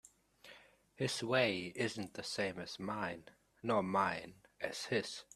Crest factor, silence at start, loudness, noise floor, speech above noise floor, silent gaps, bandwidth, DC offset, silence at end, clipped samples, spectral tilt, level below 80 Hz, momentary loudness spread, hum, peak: 22 dB; 0.45 s; -38 LUFS; -62 dBFS; 24 dB; none; 14 kHz; under 0.1%; 0.1 s; under 0.1%; -4 dB/octave; -74 dBFS; 16 LU; none; -18 dBFS